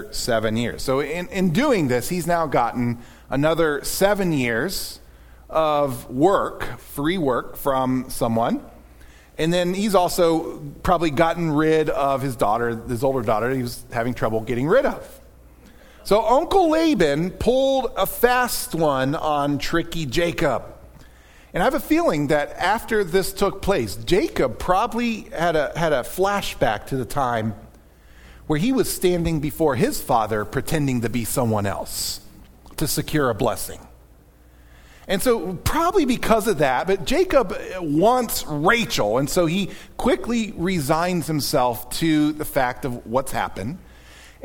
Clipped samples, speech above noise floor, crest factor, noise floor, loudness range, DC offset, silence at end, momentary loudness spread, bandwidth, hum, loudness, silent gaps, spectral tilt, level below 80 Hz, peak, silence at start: under 0.1%; 29 dB; 18 dB; -50 dBFS; 4 LU; under 0.1%; 0.15 s; 8 LU; 19 kHz; none; -21 LUFS; none; -5 dB/octave; -38 dBFS; -2 dBFS; 0 s